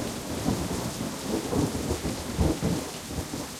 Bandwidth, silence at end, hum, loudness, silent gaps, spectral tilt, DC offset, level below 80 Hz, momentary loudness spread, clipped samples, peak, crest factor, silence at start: 16.5 kHz; 0 s; none; -30 LUFS; none; -5 dB/octave; under 0.1%; -42 dBFS; 6 LU; under 0.1%; -12 dBFS; 18 dB; 0 s